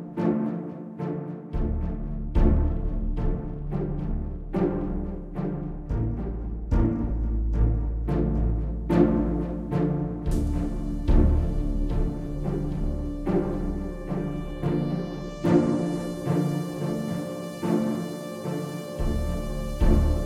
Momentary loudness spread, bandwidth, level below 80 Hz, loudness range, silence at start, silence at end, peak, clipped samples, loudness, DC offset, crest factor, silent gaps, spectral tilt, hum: 9 LU; 14.5 kHz; -28 dBFS; 4 LU; 0 s; 0 s; -6 dBFS; under 0.1%; -28 LUFS; under 0.1%; 18 dB; none; -8.5 dB/octave; none